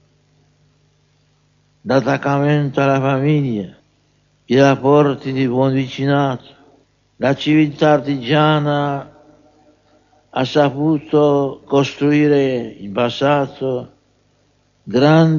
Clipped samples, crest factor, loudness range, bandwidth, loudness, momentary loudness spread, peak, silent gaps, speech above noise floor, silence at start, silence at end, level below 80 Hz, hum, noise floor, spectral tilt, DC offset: under 0.1%; 16 dB; 2 LU; 7.2 kHz; -16 LUFS; 9 LU; 0 dBFS; none; 44 dB; 1.85 s; 0 s; -58 dBFS; 50 Hz at -40 dBFS; -59 dBFS; -7.5 dB/octave; under 0.1%